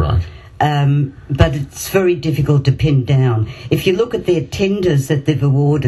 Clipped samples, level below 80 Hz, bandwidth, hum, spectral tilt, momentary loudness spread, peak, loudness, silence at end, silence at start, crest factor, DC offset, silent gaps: under 0.1%; -32 dBFS; 13.5 kHz; none; -7 dB/octave; 5 LU; 0 dBFS; -16 LUFS; 0 s; 0 s; 14 dB; under 0.1%; none